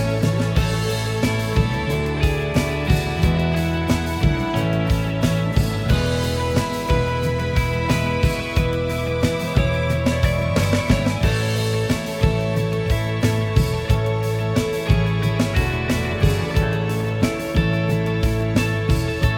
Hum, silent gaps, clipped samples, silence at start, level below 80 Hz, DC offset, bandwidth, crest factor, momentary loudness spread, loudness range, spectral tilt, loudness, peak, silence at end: none; none; under 0.1%; 0 s; -28 dBFS; under 0.1%; 17.5 kHz; 16 dB; 2 LU; 1 LU; -6 dB/octave; -21 LUFS; -2 dBFS; 0 s